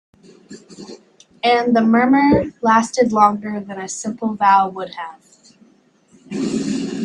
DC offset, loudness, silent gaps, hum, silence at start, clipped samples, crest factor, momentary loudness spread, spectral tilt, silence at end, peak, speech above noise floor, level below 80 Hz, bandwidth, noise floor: under 0.1%; -17 LUFS; none; none; 0.5 s; under 0.1%; 18 dB; 18 LU; -5 dB/octave; 0 s; 0 dBFS; 38 dB; -50 dBFS; 10.5 kHz; -55 dBFS